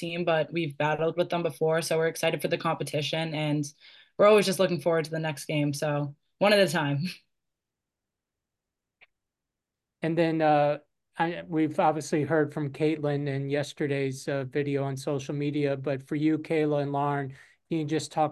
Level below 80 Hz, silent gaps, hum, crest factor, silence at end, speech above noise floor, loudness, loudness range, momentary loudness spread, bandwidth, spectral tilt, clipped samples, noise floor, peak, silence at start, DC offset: -72 dBFS; none; none; 18 dB; 0 s; 61 dB; -27 LUFS; 4 LU; 9 LU; 12.5 kHz; -5.5 dB/octave; under 0.1%; -87 dBFS; -10 dBFS; 0 s; under 0.1%